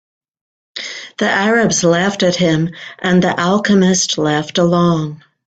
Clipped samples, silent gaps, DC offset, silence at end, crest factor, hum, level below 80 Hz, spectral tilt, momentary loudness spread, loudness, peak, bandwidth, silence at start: under 0.1%; none; under 0.1%; 0.35 s; 14 dB; none; -52 dBFS; -4.5 dB/octave; 13 LU; -14 LUFS; -2 dBFS; 9 kHz; 0.75 s